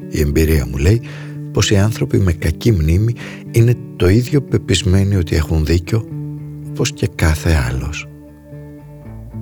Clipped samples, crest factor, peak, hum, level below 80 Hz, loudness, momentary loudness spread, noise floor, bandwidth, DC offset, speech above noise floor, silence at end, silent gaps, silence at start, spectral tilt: under 0.1%; 14 dB; 0 dBFS; none; -26 dBFS; -16 LUFS; 18 LU; -35 dBFS; 19.5 kHz; under 0.1%; 21 dB; 0 s; none; 0 s; -6 dB/octave